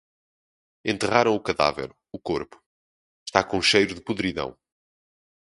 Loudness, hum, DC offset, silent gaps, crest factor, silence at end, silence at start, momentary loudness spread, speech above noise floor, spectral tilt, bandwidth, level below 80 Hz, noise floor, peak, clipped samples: -24 LUFS; none; under 0.1%; 2.66-3.26 s; 26 dB; 1 s; 0.85 s; 16 LU; over 66 dB; -4 dB/octave; 11.5 kHz; -54 dBFS; under -90 dBFS; 0 dBFS; under 0.1%